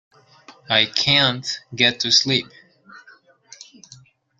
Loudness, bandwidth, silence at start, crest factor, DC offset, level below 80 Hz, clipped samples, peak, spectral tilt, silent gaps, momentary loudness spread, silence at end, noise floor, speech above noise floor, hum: -17 LUFS; 13 kHz; 0.5 s; 22 dB; under 0.1%; -60 dBFS; under 0.1%; -2 dBFS; -2.5 dB/octave; none; 12 LU; 0.75 s; -52 dBFS; 32 dB; none